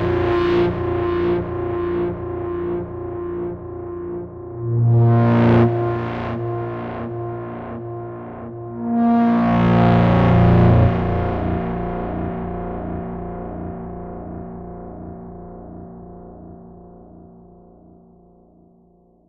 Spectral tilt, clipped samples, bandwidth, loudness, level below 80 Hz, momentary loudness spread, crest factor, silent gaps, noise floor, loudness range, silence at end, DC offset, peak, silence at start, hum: -10.5 dB/octave; under 0.1%; 5.2 kHz; -20 LUFS; -36 dBFS; 20 LU; 16 dB; none; -54 dBFS; 19 LU; 1.9 s; under 0.1%; -4 dBFS; 0 s; none